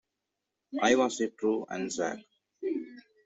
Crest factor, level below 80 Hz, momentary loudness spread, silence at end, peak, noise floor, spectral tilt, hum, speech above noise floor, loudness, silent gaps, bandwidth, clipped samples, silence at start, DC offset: 22 dB; -74 dBFS; 14 LU; 0.25 s; -10 dBFS; -86 dBFS; -3.5 dB/octave; none; 57 dB; -31 LUFS; none; 8.2 kHz; under 0.1%; 0.7 s; under 0.1%